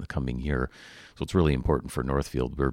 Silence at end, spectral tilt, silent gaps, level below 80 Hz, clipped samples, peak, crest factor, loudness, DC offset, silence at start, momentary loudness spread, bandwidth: 0 s; -7 dB/octave; none; -36 dBFS; under 0.1%; -10 dBFS; 18 dB; -28 LUFS; under 0.1%; 0 s; 13 LU; 15.5 kHz